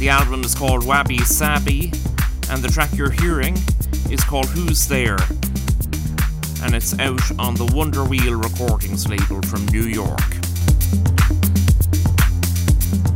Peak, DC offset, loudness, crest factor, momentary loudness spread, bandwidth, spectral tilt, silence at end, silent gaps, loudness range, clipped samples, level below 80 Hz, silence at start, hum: 0 dBFS; under 0.1%; -19 LUFS; 16 dB; 5 LU; 17 kHz; -4.5 dB/octave; 0 s; none; 2 LU; under 0.1%; -22 dBFS; 0 s; none